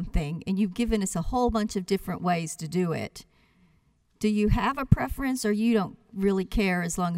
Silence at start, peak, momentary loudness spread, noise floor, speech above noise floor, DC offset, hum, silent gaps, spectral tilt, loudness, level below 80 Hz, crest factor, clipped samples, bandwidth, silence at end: 0 s; -4 dBFS; 6 LU; -66 dBFS; 39 dB; under 0.1%; none; none; -6 dB/octave; -27 LUFS; -38 dBFS; 22 dB; under 0.1%; 16 kHz; 0 s